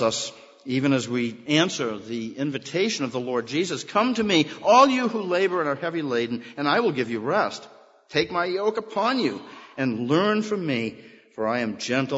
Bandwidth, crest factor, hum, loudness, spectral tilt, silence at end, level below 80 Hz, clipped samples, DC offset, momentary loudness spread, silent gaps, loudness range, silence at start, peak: 8 kHz; 22 dB; none; -24 LUFS; -4.5 dB/octave; 0 s; -68 dBFS; under 0.1%; under 0.1%; 8 LU; none; 4 LU; 0 s; -2 dBFS